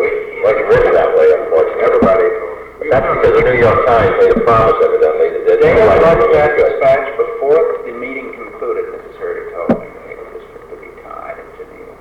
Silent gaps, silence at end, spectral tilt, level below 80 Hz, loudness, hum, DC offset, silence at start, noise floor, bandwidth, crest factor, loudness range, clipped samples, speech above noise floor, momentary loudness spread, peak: none; 0.05 s; -7.5 dB/octave; -34 dBFS; -12 LUFS; none; under 0.1%; 0 s; -33 dBFS; 6.4 kHz; 10 dB; 13 LU; under 0.1%; 23 dB; 20 LU; -4 dBFS